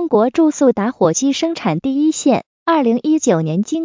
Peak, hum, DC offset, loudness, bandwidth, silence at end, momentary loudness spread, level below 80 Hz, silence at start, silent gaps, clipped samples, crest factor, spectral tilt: -2 dBFS; none; under 0.1%; -16 LUFS; 7.6 kHz; 0 s; 5 LU; -58 dBFS; 0 s; 2.46-2.66 s; under 0.1%; 14 dB; -5.5 dB/octave